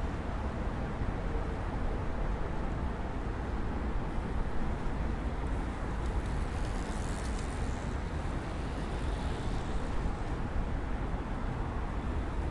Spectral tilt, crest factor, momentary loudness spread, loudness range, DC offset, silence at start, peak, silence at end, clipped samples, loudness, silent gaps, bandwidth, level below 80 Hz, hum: -7 dB/octave; 14 dB; 1 LU; 0 LU; under 0.1%; 0 s; -20 dBFS; 0 s; under 0.1%; -37 LUFS; none; 11.5 kHz; -36 dBFS; none